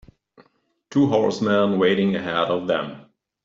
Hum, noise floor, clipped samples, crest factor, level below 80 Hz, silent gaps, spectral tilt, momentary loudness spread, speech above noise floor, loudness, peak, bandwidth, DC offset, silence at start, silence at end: none; -64 dBFS; under 0.1%; 16 dB; -62 dBFS; none; -6.5 dB/octave; 7 LU; 44 dB; -21 LUFS; -6 dBFS; 7.6 kHz; under 0.1%; 0.9 s; 0.45 s